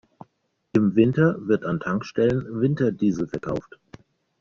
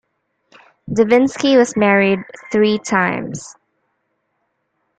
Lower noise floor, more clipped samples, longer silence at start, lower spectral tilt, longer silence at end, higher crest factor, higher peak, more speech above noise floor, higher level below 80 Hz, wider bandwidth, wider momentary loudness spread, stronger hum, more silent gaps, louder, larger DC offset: about the same, -71 dBFS vs -70 dBFS; neither; about the same, 0.75 s vs 0.85 s; first, -8 dB/octave vs -5 dB/octave; second, 0.8 s vs 1.5 s; about the same, 18 dB vs 16 dB; second, -6 dBFS vs -2 dBFS; second, 49 dB vs 54 dB; about the same, -54 dBFS vs -56 dBFS; second, 7.2 kHz vs 9.2 kHz; second, 9 LU vs 13 LU; neither; neither; second, -23 LUFS vs -15 LUFS; neither